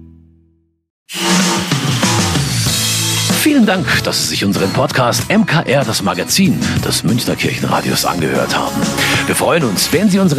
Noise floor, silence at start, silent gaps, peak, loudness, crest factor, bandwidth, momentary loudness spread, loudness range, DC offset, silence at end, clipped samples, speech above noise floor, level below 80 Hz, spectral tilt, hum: -56 dBFS; 0 s; 0.90-1.06 s; 0 dBFS; -13 LUFS; 14 dB; 15.5 kHz; 4 LU; 2 LU; under 0.1%; 0 s; under 0.1%; 42 dB; -40 dBFS; -4 dB/octave; none